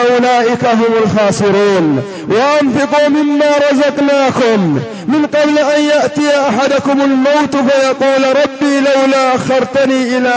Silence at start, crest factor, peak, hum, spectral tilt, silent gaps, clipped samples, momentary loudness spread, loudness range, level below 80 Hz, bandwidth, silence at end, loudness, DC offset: 0 s; 10 dB; 0 dBFS; none; -5 dB/octave; none; under 0.1%; 3 LU; 1 LU; -50 dBFS; 8 kHz; 0 s; -11 LUFS; under 0.1%